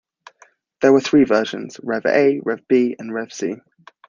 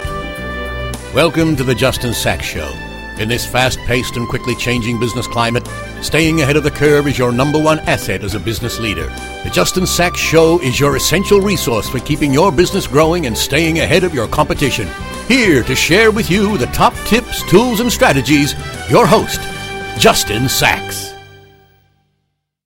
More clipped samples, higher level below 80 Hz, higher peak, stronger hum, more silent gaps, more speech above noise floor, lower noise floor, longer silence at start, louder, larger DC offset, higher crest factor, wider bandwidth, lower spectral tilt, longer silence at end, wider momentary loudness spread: neither; second, -64 dBFS vs -30 dBFS; about the same, -2 dBFS vs 0 dBFS; neither; neither; second, 37 dB vs 55 dB; second, -54 dBFS vs -69 dBFS; first, 0.8 s vs 0 s; second, -18 LUFS vs -14 LUFS; neither; about the same, 18 dB vs 14 dB; second, 7.4 kHz vs 17 kHz; about the same, -5.5 dB/octave vs -4.5 dB/octave; second, 0.5 s vs 1.3 s; about the same, 13 LU vs 12 LU